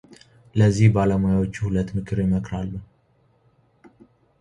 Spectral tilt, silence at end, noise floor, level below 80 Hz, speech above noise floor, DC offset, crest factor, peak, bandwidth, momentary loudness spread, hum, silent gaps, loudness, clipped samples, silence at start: -8 dB/octave; 1.55 s; -62 dBFS; -42 dBFS; 42 dB; under 0.1%; 18 dB; -4 dBFS; 9.8 kHz; 13 LU; none; none; -22 LUFS; under 0.1%; 0.55 s